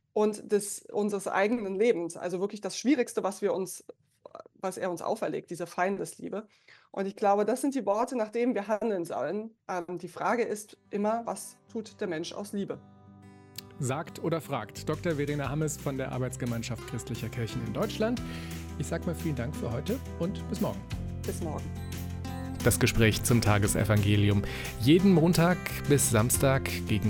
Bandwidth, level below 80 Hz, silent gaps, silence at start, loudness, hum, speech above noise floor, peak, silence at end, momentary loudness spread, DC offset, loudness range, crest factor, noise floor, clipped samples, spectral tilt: 17.5 kHz; -48 dBFS; none; 0.15 s; -30 LUFS; none; 23 dB; -12 dBFS; 0 s; 14 LU; under 0.1%; 10 LU; 18 dB; -52 dBFS; under 0.1%; -5.5 dB/octave